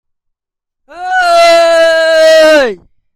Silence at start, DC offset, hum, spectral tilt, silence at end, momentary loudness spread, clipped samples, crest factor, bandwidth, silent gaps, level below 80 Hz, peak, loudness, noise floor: 0.95 s; under 0.1%; none; -1 dB/octave; 0.4 s; 10 LU; under 0.1%; 8 dB; 15.5 kHz; none; -48 dBFS; 0 dBFS; -7 LUFS; -77 dBFS